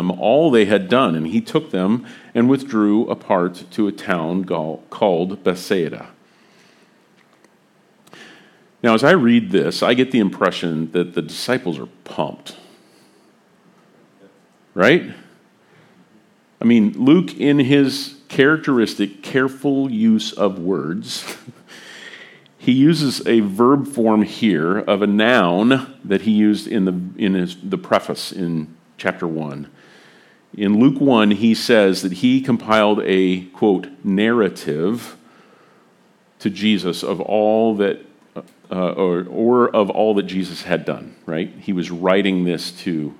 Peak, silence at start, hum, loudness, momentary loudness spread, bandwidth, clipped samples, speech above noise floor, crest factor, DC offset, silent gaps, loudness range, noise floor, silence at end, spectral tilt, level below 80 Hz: 0 dBFS; 0 s; none; -18 LUFS; 12 LU; 15 kHz; under 0.1%; 38 dB; 18 dB; under 0.1%; none; 7 LU; -56 dBFS; 0.05 s; -6 dB/octave; -66 dBFS